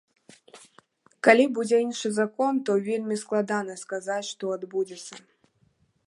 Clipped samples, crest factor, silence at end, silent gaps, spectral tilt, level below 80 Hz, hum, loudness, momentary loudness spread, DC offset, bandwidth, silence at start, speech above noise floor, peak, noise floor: under 0.1%; 24 dB; 0.9 s; none; -4.5 dB/octave; -80 dBFS; none; -25 LUFS; 14 LU; under 0.1%; 11.5 kHz; 0.55 s; 42 dB; -4 dBFS; -67 dBFS